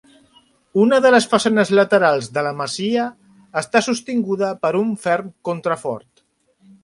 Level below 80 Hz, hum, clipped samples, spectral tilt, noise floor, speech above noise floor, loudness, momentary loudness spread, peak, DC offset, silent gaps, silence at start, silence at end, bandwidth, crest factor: -64 dBFS; none; under 0.1%; -4.5 dB/octave; -62 dBFS; 45 dB; -18 LUFS; 12 LU; 0 dBFS; under 0.1%; none; 0.75 s; 0.85 s; 11.5 kHz; 18 dB